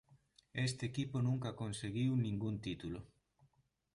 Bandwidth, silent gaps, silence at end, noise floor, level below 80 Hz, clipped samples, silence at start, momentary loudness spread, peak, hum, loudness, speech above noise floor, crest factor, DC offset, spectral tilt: 11.5 kHz; none; 0.9 s; -76 dBFS; -64 dBFS; under 0.1%; 0.1 s; 10 LU; -26 dBFS; none; -40 LUFS; 37 dB; 14 dB; under 0.1%; -6 dB/octave